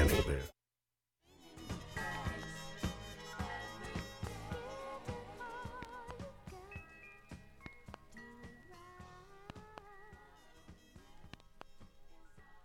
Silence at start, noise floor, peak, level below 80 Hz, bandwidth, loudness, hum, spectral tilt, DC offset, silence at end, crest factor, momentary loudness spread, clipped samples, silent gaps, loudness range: 0 s; under -90 dBFS; -18 dBFS; -50 dBFS; 17 kHz; -45 LUFS; none; -5 dB/octave; under 0.1%; 0 s; 26 dB; 18 LU; under 0.1%; none; 13 LU